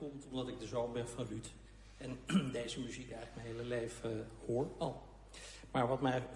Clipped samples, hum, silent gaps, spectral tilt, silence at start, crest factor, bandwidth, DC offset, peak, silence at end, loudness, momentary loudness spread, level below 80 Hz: under 0.1%; none; none; -5.5 dB/octave; 0 s; 20 dB; 11.5 kHz; under 0.1%; -20 dBFS; 0 s; -41 LUFS; 16 LU; -60 dBFS